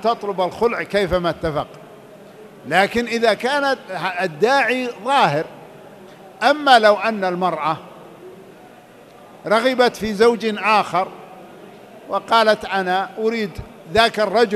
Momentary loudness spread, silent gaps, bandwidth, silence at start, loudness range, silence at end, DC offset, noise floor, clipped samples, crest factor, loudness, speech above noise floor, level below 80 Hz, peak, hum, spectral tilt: 11 LU; none; 14 kHz; 0 s; 3 LU; 0 s; under 0.1%; -44 dBFS; under 0.1%; 20 dB; -18 LUFS; 26 dB; -48 dBFS; 0 dBFS; none; -4.5 dB/octave